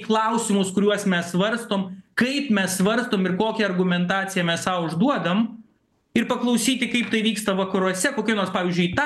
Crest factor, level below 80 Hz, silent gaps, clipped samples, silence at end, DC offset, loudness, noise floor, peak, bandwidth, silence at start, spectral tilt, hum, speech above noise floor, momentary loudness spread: 16 dB; -62 dBFS; none; under 0.1%; 0 s; under 0.1%; -22 LUFS; -63 dBFS; -6 dBFS; 12.5 kHz; 0 s; -4.5 dB/octave; none; 41 dB; 4 LU